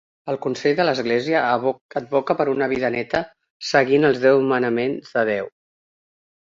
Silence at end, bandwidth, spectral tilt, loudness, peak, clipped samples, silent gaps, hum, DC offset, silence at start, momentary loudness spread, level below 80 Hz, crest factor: 1 s; 7.6 kHz; -5.5 dB/octave; -20 LUFS; -2 dBFS; under 0.1%; 1.81-1.89 s, 3.50-3.60 s; none; under 0.1%; 0.25 s; 10 LU; -60 dBFS; 18 dB